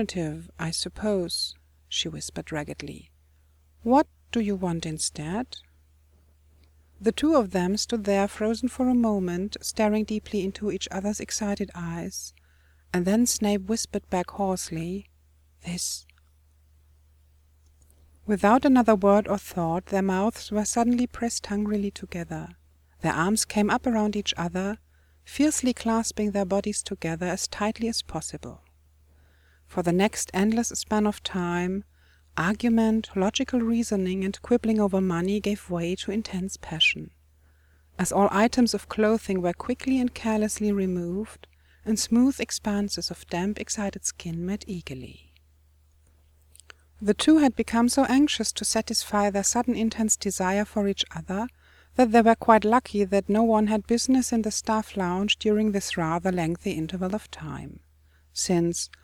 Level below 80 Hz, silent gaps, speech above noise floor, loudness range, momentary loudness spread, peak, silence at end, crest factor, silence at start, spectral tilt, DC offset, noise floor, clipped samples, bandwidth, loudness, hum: -50 dBFS; none; 35 dB; 8 LU; 13 LU; -2 dBFS; 0.2 s; 24 dB; 0 s; -4.5 dB/octave; under 0.1%; -60 dBFS; under 0.1%; 17 kHz; -25 LUFS; none